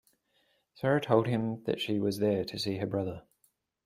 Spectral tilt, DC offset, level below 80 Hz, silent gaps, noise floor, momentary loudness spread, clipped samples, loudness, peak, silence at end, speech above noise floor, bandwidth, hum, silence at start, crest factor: -6.5 dB/octave; under 0.1%; -66 dBFS; none; -73 dBFS; 8 LU; under 0.1%; -31 LUFS; -10 dBFS; 0.65 s; 43 dB; 16 kHz; none; 0.75 s; 22 dB